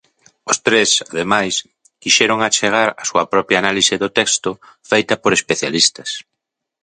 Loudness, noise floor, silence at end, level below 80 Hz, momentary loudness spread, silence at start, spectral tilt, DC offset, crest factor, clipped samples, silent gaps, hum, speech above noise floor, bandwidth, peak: -15 LUFS; -79 dBFS; 0.65 s; -56 dBFS; 13 LU; 0.45 s; -1.5 dB/octave; under 0.1%; 18 dB; under 0.1%; none; none; 62 dB; 9.8 kHz; 0 dBFS